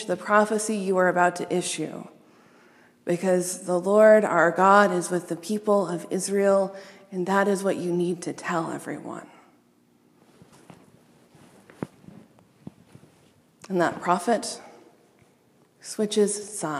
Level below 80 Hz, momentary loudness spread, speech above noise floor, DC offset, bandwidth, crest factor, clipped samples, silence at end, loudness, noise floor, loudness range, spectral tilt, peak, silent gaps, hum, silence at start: -78 dBFS; 20 LU; 38 dB; under 0.1%; 15 kHz; 22 dB; under 0.1%; 0 s; -23 LUFS; -61 dBFS; 13 LU; -4.5 dB/octave; -4 dBFS; none; none; 0 s